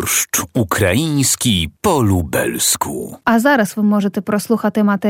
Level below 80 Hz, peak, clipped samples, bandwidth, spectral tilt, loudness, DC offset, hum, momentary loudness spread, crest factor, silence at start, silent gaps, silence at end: -42 dBFS; -2 dBFS; under 0.1%; 17.5 kHz; -4 dB/octave; -16 LUFS; under 0.1%; none; 5 LU; 14 dB; 0 s; none; 0 s